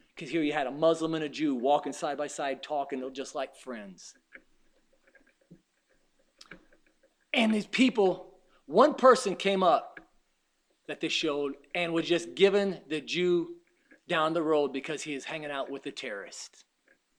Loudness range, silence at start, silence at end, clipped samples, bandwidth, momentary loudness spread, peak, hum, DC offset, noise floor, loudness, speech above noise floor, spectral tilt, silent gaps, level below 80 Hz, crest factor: 12 LU; 0.15 s; 0.7 s; under 0.1%; 11.5 kHz; 15 LU; -6 dBFS; none; under 0.1%; -74 dBFS; -29 LUFS; 45 dB; -4.5 dB/octave; none; -70 dBFS; 24 dB